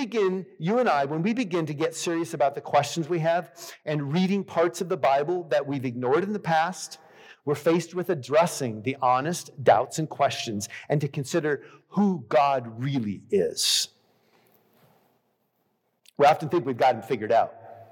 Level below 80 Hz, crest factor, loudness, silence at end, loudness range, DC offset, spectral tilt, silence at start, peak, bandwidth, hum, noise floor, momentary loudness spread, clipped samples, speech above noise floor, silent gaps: -78 dBFS; 18 dB; -25 LUFS; 0.1 s; 2 LU; under 0.1%; -5 dB/octave; 0 s; -6 dBFS; 18 kHz; none; -73 dBFS; 9 LU; under 0.1%; 48 dB; none